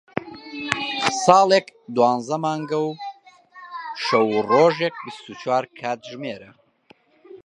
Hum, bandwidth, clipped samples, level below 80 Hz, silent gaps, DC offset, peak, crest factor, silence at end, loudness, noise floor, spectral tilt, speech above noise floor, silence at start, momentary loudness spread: none; 11.5 kHz; under 0.1%; -66 dBFS; none; under 0.1%; 0 dBFS; 22 dB; 0.1 s; -21 LUFS; -56 dBFS; -4 dB/octave; 36 dB; 0.15 s; 19 LU